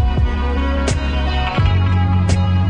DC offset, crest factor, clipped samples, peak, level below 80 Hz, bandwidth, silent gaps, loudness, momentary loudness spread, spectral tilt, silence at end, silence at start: under 0.1%; 12 dB; under 0.1%; -4 dBFS; -20 dBFS; 10 kHz; none; -17 LUFS; 3 LU; -6.5 dB/octave; 0 s; 0 s